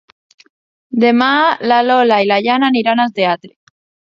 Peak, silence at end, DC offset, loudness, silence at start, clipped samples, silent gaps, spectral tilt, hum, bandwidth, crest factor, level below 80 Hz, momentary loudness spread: 0 dBFS; 0.6 s; under 0.1%; -13 LUFS; 0.9 s; under 0.1%; none; -6 dB/octave; none; 7.2 kHz; 14 dB; -66 dBFS; 6 LU